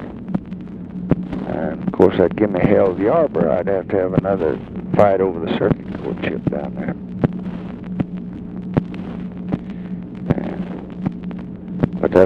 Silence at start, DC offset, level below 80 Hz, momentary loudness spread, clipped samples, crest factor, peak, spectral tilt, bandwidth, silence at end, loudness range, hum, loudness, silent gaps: 0 s; under 0.1%; -42 dBFS; 14 LU; under 0.1%; 18 dB; 0 dBFS; -9.5 dB/octave; 6 kHz; 0 s; 8 LU; none; -20 LUFS; none